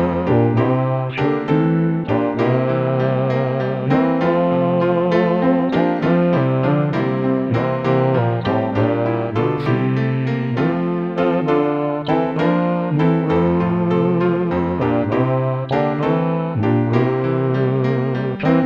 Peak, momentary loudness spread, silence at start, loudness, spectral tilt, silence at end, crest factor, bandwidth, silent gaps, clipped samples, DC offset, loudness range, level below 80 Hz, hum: -2 dBFS; 3 LU; 0 s; -18 LUFS; -9.5 dB/octave; 0 s; 14 dB; 6.2 kHz; none; under 0.1%; 0.1%; 2 LU; -48 dBFS; none